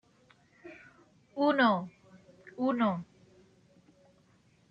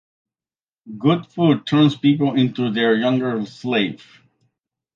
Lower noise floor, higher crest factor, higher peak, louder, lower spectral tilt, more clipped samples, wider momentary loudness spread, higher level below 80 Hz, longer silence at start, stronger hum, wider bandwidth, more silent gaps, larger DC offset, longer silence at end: second, -66 dBFS vs under -90 dBFS; about the same, 22 dB vs 18 dB; second, -12 dBFS vs -2 dBFS; second, -29 LUFS vs -19 LUFS; about the same, -7.5 dB/octave vs -7.5 dB/octave; neither; first, 27 LU vs 9 LU; second, -78 dBFS vs -66 dBFS; second, 0.65 s vs 0.85 s; neither; about the same, 7.2 kHz vs 7.4 kHz; neither; neither; first, 1.65 s vs 1 s